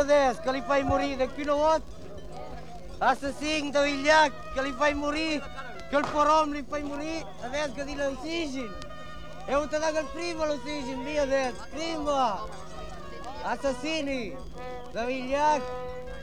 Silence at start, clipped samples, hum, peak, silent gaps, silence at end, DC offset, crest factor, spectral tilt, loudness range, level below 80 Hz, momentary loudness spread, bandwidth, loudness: 0 s; under 0.1%; none; -8 dBFS; none; 0 s; 1%; 20 dB; -4 dB/octave; 6 LU; -48 dBFS; 18 LU; 12 kHz; -28 LUFS